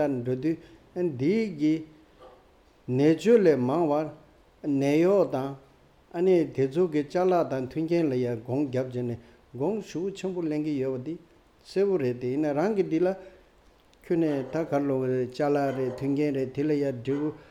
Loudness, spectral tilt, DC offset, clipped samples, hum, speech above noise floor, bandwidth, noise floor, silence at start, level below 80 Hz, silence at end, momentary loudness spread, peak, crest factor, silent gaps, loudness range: -27 LUFS; -8 dB/octave; under 0.1%; under 0.1%; none; 33 dB; 13 kHz; -59 dBFS; 0 s; -62 dBFS; 0.1 s; 11 LU; -8 dBFS; 18 dB; none; 5 LU